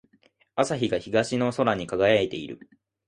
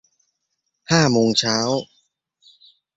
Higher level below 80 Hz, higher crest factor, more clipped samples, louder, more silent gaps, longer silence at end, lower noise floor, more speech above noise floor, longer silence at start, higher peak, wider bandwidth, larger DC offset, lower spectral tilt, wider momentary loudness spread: about the same, -58 dBFS vs -56 dBFS; about the same, 20 dB vs 20 dB; neither; second, -25 LUFS vs -18 LUFS; neither; second, 0.5 s vs 1.1 s; second, -64 dBFS vs -76 dBFS; second, 39 dB vs 57 dB; second, 0.55 s vs 0.9 s; second, -6 dBFS vs -2 dBFS; first, 11 kHz vs 8 kHz; neither; about the same, -5 dB/octave vs -4 dB/octave; first, 14 LU vs 7 LU